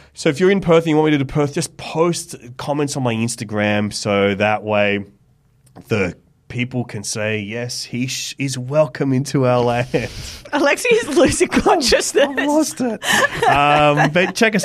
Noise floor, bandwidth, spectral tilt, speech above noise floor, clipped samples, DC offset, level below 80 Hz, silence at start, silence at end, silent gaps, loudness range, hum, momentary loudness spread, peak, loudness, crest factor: -55 dBFS; 15.5 kHz; -4.5 dB/octave; 38 dB; under 0.1%; under 0.1%; -44 dBFS; 0.2 s; 0 s; none; 7 LU; none; 10 LU; -4 dBFS; -17 LUFS; 14 dB